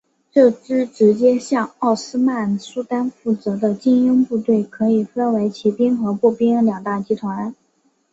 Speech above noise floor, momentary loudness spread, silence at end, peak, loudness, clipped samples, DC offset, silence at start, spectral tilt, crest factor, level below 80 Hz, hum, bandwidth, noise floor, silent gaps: 46 dB; 8 LU; 0.6 s; -2 dBFS; -18 LUFS; under 0.1%; under 0.1%; 0.35 s; -7 dB/octave; 16 dB; -62 dBFS; none; 8 kHz; -63 dBFS; none